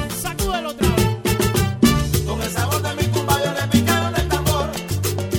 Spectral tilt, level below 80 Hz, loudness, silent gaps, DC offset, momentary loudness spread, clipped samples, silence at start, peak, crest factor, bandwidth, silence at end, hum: -5 dB/octave; -30 dBFS; -20 LUFS; none; under 0.1%; 6 LU; under 0.1%; 0 s; -2 dBFS; 18 dB; 17.5 kHz; 0 s; none